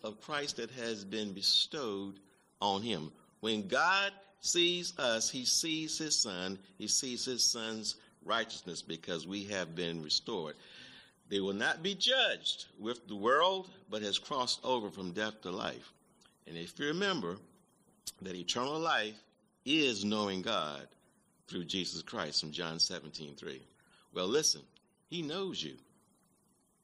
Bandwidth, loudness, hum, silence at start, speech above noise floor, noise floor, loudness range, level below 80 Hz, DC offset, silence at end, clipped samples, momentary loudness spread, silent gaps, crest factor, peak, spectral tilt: 14 kHz; -34 LUFS; none; 0.05 s; 37 dB; -72 dBFS; 6 LU; -76 dBFS; under 0.1%; 1.05 s; under 0.1%; 16 LU; none; 20 dB; -16 dBFS; -2 dB/octave